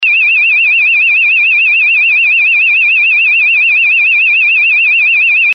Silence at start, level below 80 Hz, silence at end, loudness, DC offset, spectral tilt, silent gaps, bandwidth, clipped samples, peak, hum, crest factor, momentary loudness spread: 0 s; -68 dBFS; 0 s; -6 LUFS; under 0.1%; 8 dB/octave; none; 5.8 kHz; under 0.1%; -4 dBFS; none; 4 dB; 0 LU